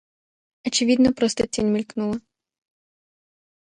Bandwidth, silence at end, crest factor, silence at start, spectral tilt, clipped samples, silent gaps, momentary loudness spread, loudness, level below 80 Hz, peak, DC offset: 10.5 kHz; 1.6 s; 18 dB; 0.65 s; -4 dB/octave; under 0.1%; none; 11 LU; -22 LUFS; -54 dBFS; -8 dBFS; under 0.1%